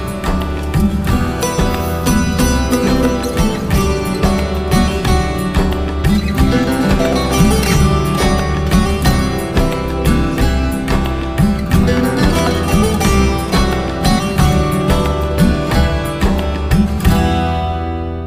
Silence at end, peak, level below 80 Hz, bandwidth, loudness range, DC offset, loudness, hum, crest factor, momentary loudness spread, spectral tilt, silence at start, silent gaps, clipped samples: 0 s; 0 dBFS; -20 dBFS; 16 kHz; 2 LU; under 0.1%; -15 LUFS; none; 14 dB; 4 LU; -5.5 dB/octave; 0 s; none; under 0.1%